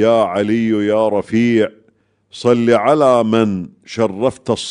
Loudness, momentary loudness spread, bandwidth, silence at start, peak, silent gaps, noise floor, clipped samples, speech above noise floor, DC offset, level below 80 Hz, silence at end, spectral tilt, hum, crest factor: -15 LUFS; 8 LU; 10.5 kHz; 0 s; 0 dBFS; none; -58 dBFS; under 0.1%; 43 dB; under 0.1%; -56 dBFS; 0 s; -6.5 dB/octave; none; 14 dB